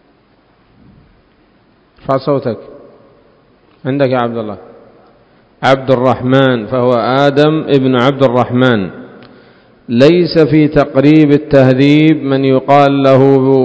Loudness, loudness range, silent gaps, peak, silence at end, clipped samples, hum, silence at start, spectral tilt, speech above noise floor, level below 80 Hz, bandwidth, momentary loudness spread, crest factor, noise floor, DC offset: -10 LUFS; 12 LU; none; 0 dBFS; 0 s; 1%; none; 2.1 s; -8 dB/octave; 41 dB; -44 dBFS; 8 kHz; 10 LU; 12 dB; -50 dBFS; under 0.1%